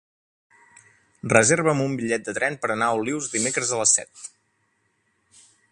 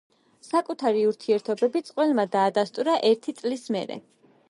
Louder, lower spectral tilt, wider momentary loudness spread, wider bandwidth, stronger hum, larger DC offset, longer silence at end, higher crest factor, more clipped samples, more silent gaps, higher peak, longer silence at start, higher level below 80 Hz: first, -21 LUFS vs -25 LUFS; second, -3 dB/octave vs -5 dB/octave; first, 15 LU vs 8 LU; about the same, 11.5 kHz vs 11.5 kHz; neither; neither; first, 1.45 s vs 0.5 s; first, 24 dB vs 16 dB; neither; neither; first, 0 dBFS vs -10 dBFS; first, 1.25 s vs 0.45 s; first, -62 dBFS vs -80 dBFS